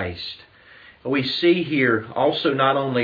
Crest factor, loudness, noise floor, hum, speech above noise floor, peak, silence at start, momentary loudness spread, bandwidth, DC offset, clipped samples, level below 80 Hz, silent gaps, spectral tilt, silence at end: 18 dB; -20 LUFS; -48 dBFS; none; 28 dB; -4 dBFS; 0 s; 14 LU; 5 kHz; under 0.1%; under 0.1%; -58 dBFS; none; -7.5 dB/octave; 0 s